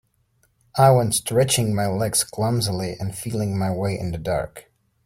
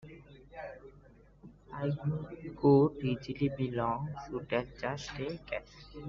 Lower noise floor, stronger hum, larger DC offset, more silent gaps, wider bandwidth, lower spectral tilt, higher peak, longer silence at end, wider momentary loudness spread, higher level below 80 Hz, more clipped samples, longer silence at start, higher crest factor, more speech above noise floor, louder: first, -65 dBFS vs -59 dBFS; neither; neither; neither; first, 16.5 kHz vs 7.2 kHz; second, -5 dB/octave vs -7 dB/octave; first, -2 dBFS vs -14 dBFS; first, 0.45 s vs 0 s; second, 11 LU vs 21 LU; first, -48 dBFS vs -58 dBFS; neither; first, 0.75 s vs 0.05 s; about the same, 20 dB vs 20 dB; first, 44 dB vs 26 dB; first, -22 LUFS vs -33 LUFS